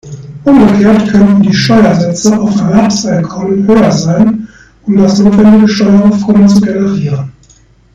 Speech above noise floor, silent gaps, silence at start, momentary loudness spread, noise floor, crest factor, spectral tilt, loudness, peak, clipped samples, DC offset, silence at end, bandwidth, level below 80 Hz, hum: 37 dB; none; 0.05 s; 9 LU; -43 dBFS; 8 dB; -6.5 dB/octave; -8 LUFS; 0 dBFS; 6%; under 0.1%; 0.65 s; 7.8 kHz; -36 dBFS; none